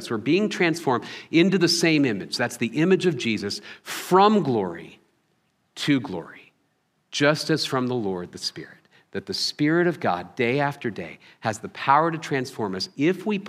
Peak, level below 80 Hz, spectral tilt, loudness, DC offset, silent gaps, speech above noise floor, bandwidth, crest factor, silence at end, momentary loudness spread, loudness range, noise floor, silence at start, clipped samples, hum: -4 dBFS; -70 dBFS; -5 dB/octave; -23 LUFS; under 0.1%; none; 47 dB; 15.5 kHz; 20 dB; 0 s; 14 LU; 5 LU; -70 dBFS; 0 s; under 0.1%; none